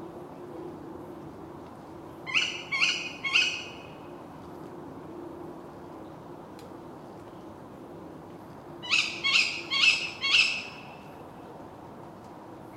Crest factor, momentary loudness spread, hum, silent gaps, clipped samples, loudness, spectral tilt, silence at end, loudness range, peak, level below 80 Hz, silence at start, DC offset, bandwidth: 24 dB; 23 LU; none; none; under 0.1%; -24 LUFS; -1.5 dB/octave; 0 s; 19 LU; -8 dBFS; -66 dBFS; 0 s; under 0.1%; 16 kHz